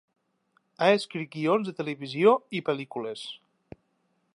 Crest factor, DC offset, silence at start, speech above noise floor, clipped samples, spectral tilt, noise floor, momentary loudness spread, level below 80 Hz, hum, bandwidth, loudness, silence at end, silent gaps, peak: 22 dB; under 0.1%; 0.8 s; 47 dB; under 0.1%; -6 dB/octave; -73 dBFS; 14 LU; -74 dBFS; none; 11.5 kHz; -27 LUFS; 1 s; none; -8 dBFS